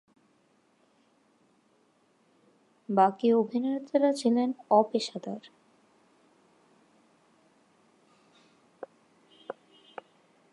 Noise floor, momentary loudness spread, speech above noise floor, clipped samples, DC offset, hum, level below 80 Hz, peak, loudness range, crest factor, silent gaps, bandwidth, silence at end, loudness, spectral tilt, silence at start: -68 dBFS; 24 LU; 41 dB; under 0.1%; under 0.1%; none; -88 dBFS; -8 dBFS; 23 LU; 24 dB; none; 11.5 kHz; 1 s; -27 LUFS; -6 dB/octave; 2.9 s